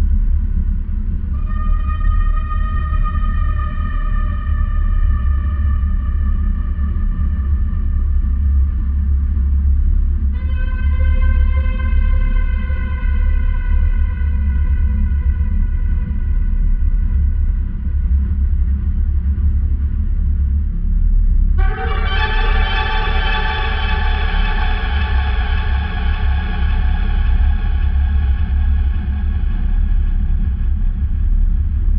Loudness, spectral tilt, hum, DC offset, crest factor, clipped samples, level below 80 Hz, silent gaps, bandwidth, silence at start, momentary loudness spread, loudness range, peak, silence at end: -19 LUFS; -5.5 dB/octave; none; under 0.1%; 12 dB; under 0.1%; -14 dBFS; none; 4.9 kHz; 0 s; 3 LU; 2 LU; -4 dBFS; 0 s